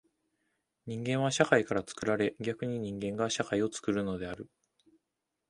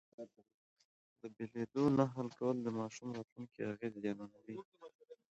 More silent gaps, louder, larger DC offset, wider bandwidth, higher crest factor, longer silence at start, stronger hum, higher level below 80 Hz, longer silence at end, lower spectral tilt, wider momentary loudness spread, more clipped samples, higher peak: second, none vs 0.54-0.76 s, 0.85-1.16 s, 3.32-3.36 s, 4.65-4.72 s, 4.95-4.99 s; first, -32 LUFS vs -40 LUFS; neither; first, 11.5 kHz vs 8 kHz; about the same, 26 dB vs 22 dB; first, 0.85 s vs 0.2 s; neither; first, -64 dBFS vs -78 dBFS; first, 1.05 s vs 0.2 s; second, -5 dB/octave vs -7.5 dB/octave; second, 15 LU vs 21 LU; neither; first, -8 dBFS vs -20 dBFS